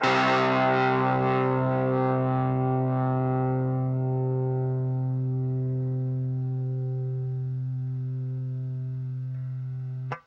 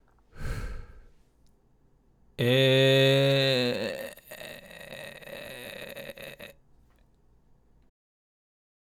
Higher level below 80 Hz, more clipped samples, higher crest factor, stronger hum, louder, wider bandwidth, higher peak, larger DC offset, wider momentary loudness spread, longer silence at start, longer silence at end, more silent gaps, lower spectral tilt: second, -62 dBFS vs -48 dBFS; neither; about the same, 18 dB vs 18 dB; neither; second, -27 LUFS vs -24 LUFS; second, 6.6 kHz vs 17.5 kHz; first, -8 dBFS vs -12 dBFS; neither; second, 10 LU vs 23 LU; second, 0 s vs 0.35 s; second, 0.1 s vs 2.35 s; neither; first, -8 dB/octave vs -5.5 dB/octave